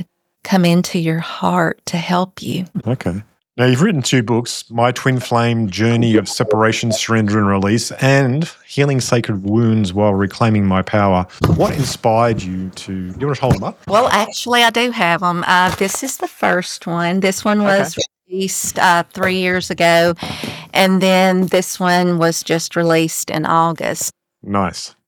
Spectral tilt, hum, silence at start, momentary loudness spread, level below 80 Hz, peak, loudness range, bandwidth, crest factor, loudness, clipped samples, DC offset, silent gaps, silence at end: -5 dB/octave; none; 0 s; 9 LU; -46 dBFS; -2 dBFS; 3 LU; over 20 kHz; 14 dB; -16 LUFS; under 0.1%; under 0.1%; none; 0.2 s